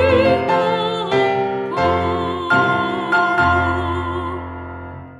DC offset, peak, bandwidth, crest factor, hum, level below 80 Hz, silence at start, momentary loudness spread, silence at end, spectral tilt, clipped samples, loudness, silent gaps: under 0.1%; -4 dBFS; 11 kHz; 14 dB; none; -40 dBFS; 0 s; 12 LU; 0 s; -6.5 dB/octave; under 0.1%; -18 LUFS; none